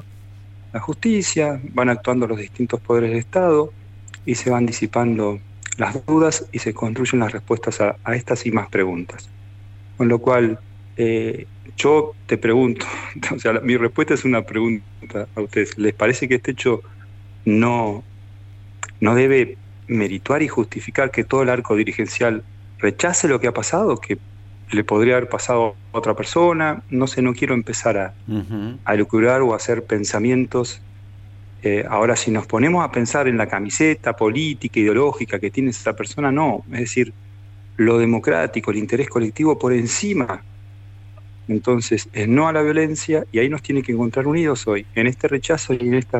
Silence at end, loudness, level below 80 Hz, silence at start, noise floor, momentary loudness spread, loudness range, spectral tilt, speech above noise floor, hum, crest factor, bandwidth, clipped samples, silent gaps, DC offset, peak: 0 s; -19 LUFS; -50 dBFS; 0 s; -40 dBFS; 9 LU; 2 LU; -5.5 dB/octave; 21 dB; none; 14 dB; 8.6 kHz; under 0.1%; none; under 0.1%; -4 dBFS